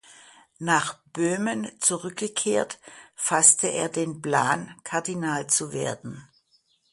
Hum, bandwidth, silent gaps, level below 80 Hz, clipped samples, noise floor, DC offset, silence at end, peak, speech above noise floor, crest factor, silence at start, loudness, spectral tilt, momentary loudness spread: none; 11.5 kHz; none; -68 dBFS; under 0.1%; -66 dBFS; under 0.1%; 0.7 s; -4 dBFS; 41 dB; 24 dB; 0.6 s; -24 LUFS; -2.5 dB/octave; 17 LU